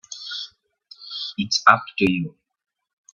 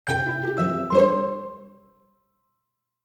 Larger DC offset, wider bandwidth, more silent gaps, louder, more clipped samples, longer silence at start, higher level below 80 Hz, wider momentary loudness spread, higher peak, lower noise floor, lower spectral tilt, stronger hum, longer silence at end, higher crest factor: neither; second, 9 kHz vs 13 kHz; neither; about the same, -21 LUFS vs -22 LUFS; neither; about the same, 0.1 s vs 0.05 s; about the same, -64 dBFS vs -60 dBFS; first, 18 LU vs 14 LU; first, 0 dBFS vs -6 dBFS; second, -51 dBFS vs -80 dBFS; second, -3.5 dB/octave vs -6.5 dB/octave; neither; second, 0.85 s vs 1.35 s; about the same, 24 dB vs 20 dB